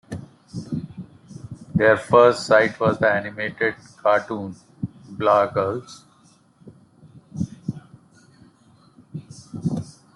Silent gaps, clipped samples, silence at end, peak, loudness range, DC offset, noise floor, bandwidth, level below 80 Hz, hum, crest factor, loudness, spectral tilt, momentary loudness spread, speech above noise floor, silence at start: none; under 0.1%; 0.25 s; -2 dBFS; 18 LU; under 0.1%; -56 dBFS; 11.5 kHz; -58 dBFS; none; 20 dB; -21 LUFS; -6 dB/octave; 24 LU; 37 dB; 0.1 s